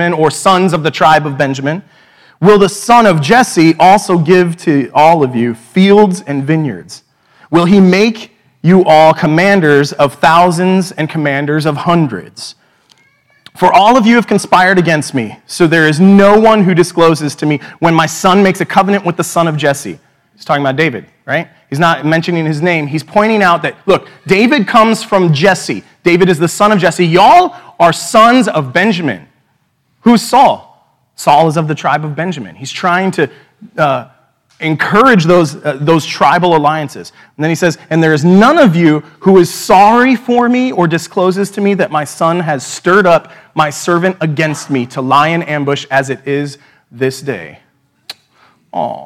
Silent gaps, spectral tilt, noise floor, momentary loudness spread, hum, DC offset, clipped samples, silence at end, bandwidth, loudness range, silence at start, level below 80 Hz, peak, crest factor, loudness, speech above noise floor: none; -5.5 dB/octave; -58 dBFS; 11 LU; none; under 0.1%; 1%; 0 s; 15.5 kHz; 6 LU; 0 s; -48 dBFS; 0 dBFS; 10 dB; -10 LUFS; 49 dB